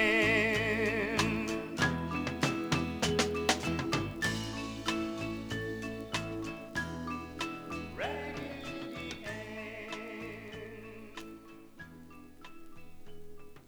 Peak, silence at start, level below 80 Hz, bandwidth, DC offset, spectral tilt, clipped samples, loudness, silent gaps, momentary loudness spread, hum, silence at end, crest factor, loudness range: -14 dBFS; 0 s; -54 dBFS; over 20 kHz; under 0.1%; -4 dB/octave; under 0.1%; -34 LUFS; none; 21 LU; none; 0 s; 22 dB; 14 LU